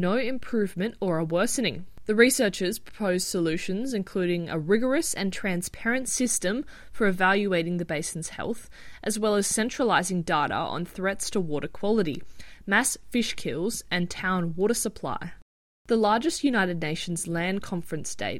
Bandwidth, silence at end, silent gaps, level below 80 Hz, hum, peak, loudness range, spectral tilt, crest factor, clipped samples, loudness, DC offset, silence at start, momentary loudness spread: 16.5 kHz; 0 s; 15.42-15.85 s; -52 dBFS; none; -6 dBFS; 2 LU; -4 dB/octave; 22 dB; under 0.1%; -26 LUFS; under 0.1%; 0 s; 9 LU